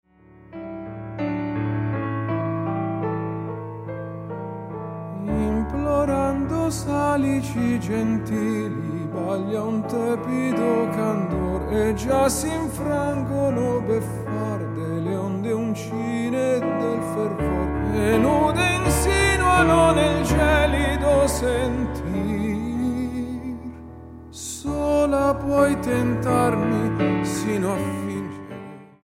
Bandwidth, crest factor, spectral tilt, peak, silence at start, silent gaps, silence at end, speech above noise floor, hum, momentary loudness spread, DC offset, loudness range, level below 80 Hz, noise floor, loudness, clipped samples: 16.5 kHz; 18 dB; -6 dB/octave; -4 dBFS; 0.4 s; none; 0.2 s; 28 dB; none; 14 LU; under 0.1%; 8 LU; -36 dBFS; -49 dBFS; -23 LUFS; under 0.1%